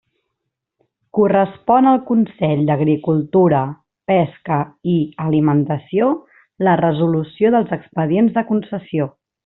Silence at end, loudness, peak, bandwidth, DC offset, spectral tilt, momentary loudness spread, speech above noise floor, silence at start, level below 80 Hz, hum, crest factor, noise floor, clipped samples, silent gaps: 0.35 s; -17 LUFS; -2 dBFS; 4.1 kHz; under 0.1%; -7.5 dB/octave; 9 LU; 62 dB; 1.15 s; -58 dBFS; none; 16 dB; -78 dBFS; under 0.1%; none